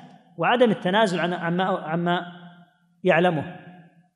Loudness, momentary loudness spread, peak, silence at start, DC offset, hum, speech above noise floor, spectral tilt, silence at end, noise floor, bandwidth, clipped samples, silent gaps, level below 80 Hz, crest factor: -23 LUFS; 11 LU; -6 dBFS; 0 s; under 0.1%; none; 33 dB; -6.5 dB/octave; 0.4 s; -55 dBFS; 11 kHz; under 0.1%; none; -74 dBFS; 18 dB